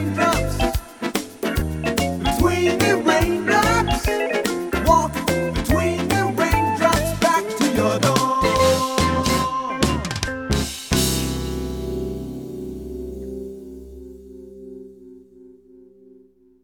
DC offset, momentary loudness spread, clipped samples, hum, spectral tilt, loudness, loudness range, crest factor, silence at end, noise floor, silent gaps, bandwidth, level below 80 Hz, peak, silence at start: under 0.1%; 15 LU; under 0.1%; none; -4.5 dB/octave; -20 LUFS; 15 LU; 20 dB; 1.1 s; -52 dBFS; none; over 20 kHz; -32 dBFS; 0 dBFS; 0 s